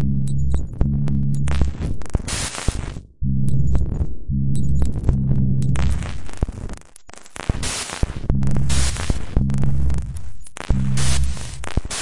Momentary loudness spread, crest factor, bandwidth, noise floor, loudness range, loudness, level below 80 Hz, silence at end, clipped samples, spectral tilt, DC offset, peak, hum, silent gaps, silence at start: 11 LU; 16 dB; 11.5 kHz; -42 dBFS; 3 LU; -23 LUFS; -26 dBFS; 0 s; under 0.1%; -5.5 dB/octave; under 0.1%; -2 dBFS; none; none; 0 s